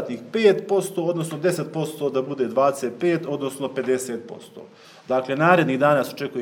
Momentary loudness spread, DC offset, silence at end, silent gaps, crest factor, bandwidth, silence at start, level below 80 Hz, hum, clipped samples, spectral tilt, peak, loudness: 10 LU; under 0.1%; 0 s; none; 20 dB; 19.5 kHz; 0 s; -76 dBFS; none; under 0.1%; -5.5 dB/octave; -2 dBFS; -22 LUFS